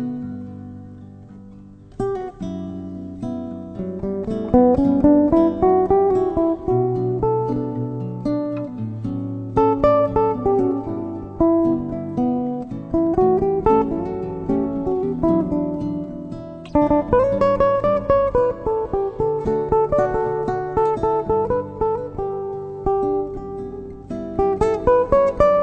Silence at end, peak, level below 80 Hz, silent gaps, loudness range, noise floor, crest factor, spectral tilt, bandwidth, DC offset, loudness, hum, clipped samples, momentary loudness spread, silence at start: 0 s; -2 dBFS; -38 dBFS; none; 6 LU; -42 dBFS; 18 dB; -9.5 dB/octave; 8.4 kHz; under 0.1%; -20 LUFS; none; under 0.1%; 14 LU; 0 s